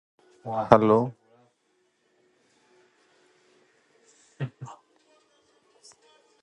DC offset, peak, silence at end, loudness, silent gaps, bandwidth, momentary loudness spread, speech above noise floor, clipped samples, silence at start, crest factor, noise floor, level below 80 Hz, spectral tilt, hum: under 0.1%; 0 dBFS; 1.7 s; -24 LUFS; none; 9.8 kHz; 26 LU; 48 dB; under 0.1%; 0.45 s; 30 dB; -71 dBFS; -62 dBFS; -8 dB/octave; none